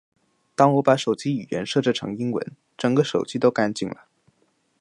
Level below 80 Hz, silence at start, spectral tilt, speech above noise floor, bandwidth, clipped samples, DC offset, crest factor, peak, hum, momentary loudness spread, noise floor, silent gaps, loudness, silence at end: -66 dBFS; 0.6 s; -6 dB/octave; 45 dB; 11 kHz; under 0.1%; under 0.1%; 20 dB; -4 dBFS; none; 12 LU; -67 dBFS; none; -23 LUFS; 0.85 s